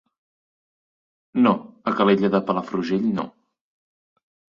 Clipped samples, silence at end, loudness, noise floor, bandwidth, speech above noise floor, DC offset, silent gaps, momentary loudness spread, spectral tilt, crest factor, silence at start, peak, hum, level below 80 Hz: under 0.1%; 1.3 s; -22 LUFS; under -90 dBFS; 7.2 kHz; over 70 dB; under 0.1%; none; 10 LU; -8 dB/octave; 20 dB; 1.35 s; -6 dBFS; none; -64 dBFS